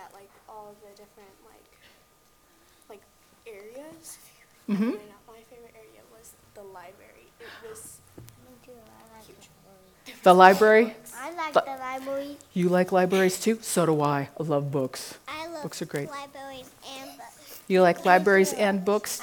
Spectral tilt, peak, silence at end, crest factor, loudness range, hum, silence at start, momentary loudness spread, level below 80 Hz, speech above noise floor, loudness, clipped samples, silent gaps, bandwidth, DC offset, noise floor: -5 dB/octave; 0 dBFS; 0 s; 26 dB; 24 LU; none; 0 s; 26 LU; -68 dBFS; 35 dB; -23 LUFS; under 0.1%; none; 19.5 kHz; under 0.1%; -61 dBFS